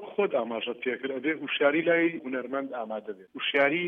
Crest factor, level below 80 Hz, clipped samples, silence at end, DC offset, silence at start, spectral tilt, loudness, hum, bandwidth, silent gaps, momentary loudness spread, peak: 18 dB; -82 dBFS; under 0.1%; 0 s; under 0.1%; 0 s; -7 dB/octave; -28 LUFS; none; 4.9 kHz; none; 11 LU; -10 dBFS